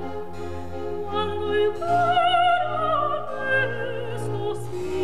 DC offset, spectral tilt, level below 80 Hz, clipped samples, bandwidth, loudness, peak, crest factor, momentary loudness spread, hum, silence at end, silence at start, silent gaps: 2%; -5.5 dB/octave; -50 dBFS; under 0.1%; 13 kHz; -24 LUFS; -10 dBFS; 14 dB; 14 LU; none; 0 s; 0 s; none